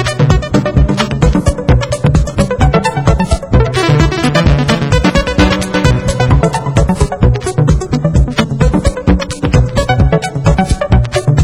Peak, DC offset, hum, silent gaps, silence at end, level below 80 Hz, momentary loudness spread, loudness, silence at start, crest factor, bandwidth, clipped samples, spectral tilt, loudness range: 0 dBFS; under 0.1%; none; none; 0 s; -16 dBFS; 2 LU; -12 LUFS; 0 s; 10 dB; 12.5 kHz; 0.1%; -6 dB/octave; 1 LU